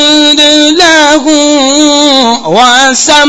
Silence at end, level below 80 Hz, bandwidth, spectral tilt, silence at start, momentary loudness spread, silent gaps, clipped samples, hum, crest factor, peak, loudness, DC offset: 0 s; -40 dBFS; 11 kHz; -1 dB/octave; 0 s; 3 LU; none; 7%; none; 4 dB; 0 dBFS; -4 LUFS; under 0.1%